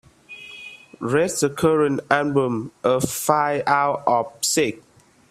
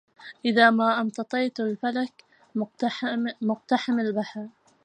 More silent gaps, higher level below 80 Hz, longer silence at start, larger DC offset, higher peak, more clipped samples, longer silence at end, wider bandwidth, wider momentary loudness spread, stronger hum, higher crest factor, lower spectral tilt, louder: neither; first, -60 dBFS vs -80 dBFS; about the same, 0.3 s vs 0.2 s; neither; first, 0 dBFS vs -4 dBFS; neither; first, 0.55 s vs 0.35 s; first, 15.5 kHz vs 9.4 kHz; about the same, 18 LU vs 16 LU; neither; about the same, 22 dB vs 22 dB; second, -4 dB/octave vs -5.5 dB/octave; first, -21 LUFS vs -25 LUFS